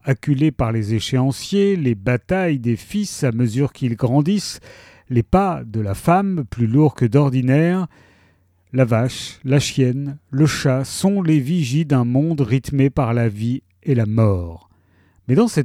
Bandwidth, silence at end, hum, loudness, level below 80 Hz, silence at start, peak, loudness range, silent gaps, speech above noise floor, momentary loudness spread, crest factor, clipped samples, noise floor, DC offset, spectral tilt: 14.5 kHz; 0 s; none; -19 LUFS; -42 dBFS; 0.05 s; -2 dBFS; 2 LU; none; 40 dB; 8 LU; 16 dB; under 0.1%; -57 dBFS; under 0.1%; -7 dB/octave